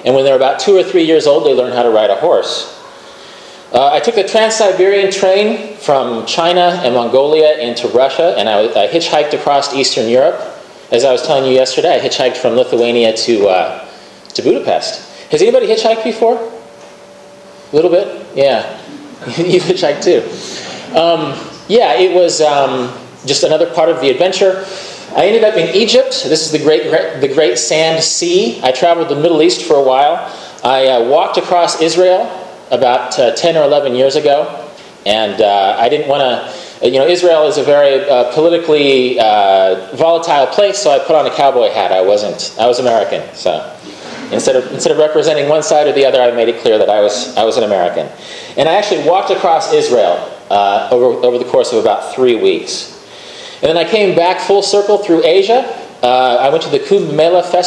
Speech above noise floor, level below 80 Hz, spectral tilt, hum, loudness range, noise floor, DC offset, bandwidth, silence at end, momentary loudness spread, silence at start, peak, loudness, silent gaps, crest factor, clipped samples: 25 dB; -58 dBFS; -3.5 dB/octave; none; 3 LU; -36 dBFS; under 0.1%; 11 kHz; 0 s; 10 LU; 0 s; 0 dBFS; -11 LUFS; none; 12 dB; under 0.1%